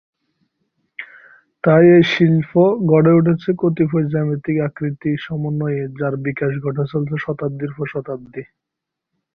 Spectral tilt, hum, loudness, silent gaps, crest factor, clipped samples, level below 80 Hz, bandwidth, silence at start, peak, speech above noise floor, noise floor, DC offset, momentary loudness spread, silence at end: -9 dB/octave; none; -17 LUFS; none; 16 dB; under 0.1%; -56 dBFS; 6.4 kHz; 1 s; -2 dBFS; 66 dB; -82 dBFS; under 0.1%; 18 LU; 0.95 s